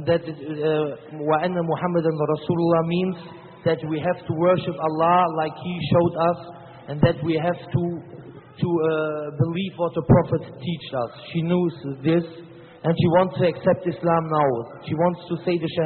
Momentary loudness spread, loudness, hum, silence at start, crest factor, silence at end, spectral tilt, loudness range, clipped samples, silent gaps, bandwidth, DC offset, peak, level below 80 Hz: 11 LU; -23 LUFS; none; 0 s; 18 dB; 0 s; -6.5 dB/octave; 2 LU; under 0.1%; none; 4.4 kHz; under 0.1%; -4 dBFS; -50 dBFS